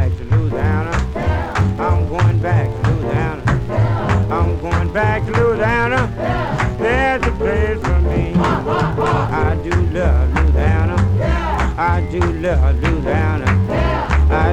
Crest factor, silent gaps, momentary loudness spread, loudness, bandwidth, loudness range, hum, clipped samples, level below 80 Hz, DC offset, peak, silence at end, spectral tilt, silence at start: 14 dB; none; 3 LU; -17 LUFS; 9 kHz; 1 LU; none; under 0.1%; -22 dBFS; under 0.1%; -2 dBFS; 0 s; -7.5 dB/octave; 0 s